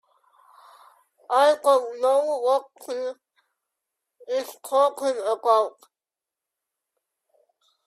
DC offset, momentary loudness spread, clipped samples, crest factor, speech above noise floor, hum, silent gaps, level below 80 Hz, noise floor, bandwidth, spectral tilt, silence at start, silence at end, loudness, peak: under 0.1%; 12 LU; under 0.1%; 20 dB; 67 dB; none; none; -84 dBFS; -90 dBFS; 14 kHz; -1 dB/octave; 1.3 s; 2.15 s; -23 LUFS; -6 dBFS